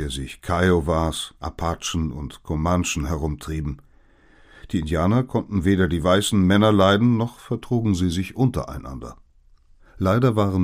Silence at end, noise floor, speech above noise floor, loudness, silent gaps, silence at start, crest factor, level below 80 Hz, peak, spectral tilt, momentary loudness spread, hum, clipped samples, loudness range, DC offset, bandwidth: 0 s; -54 dBFS; 33 dB; -22 LUFS; none; 0 s; 18 dB; -36 dBFS; -2 dBFS; -6 dB/octave; 14 LU; none; under 0.1%; 7 LU; under 0.1%; 15.5 kHz